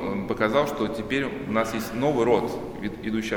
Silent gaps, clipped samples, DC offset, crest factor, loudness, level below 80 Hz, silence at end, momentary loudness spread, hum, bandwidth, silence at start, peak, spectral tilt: none; under 0.1%; under 0.1%; 18 dB; -26 LUFS; -48 dBFS; 0 s; 9 LU; none; 17.5 kHz; 0 s; -8 dBFS; -5.5 dB/octave